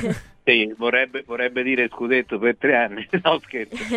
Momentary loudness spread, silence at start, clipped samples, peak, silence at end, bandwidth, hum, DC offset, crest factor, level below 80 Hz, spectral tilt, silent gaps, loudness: 7 LU; 0 s; under 0.1%; 0 dBFS; 0 s; 11.5 kHz; none; under 0.1%; 20 dB; -54 dBFS; -5 dB/octave; none; -21 LUFS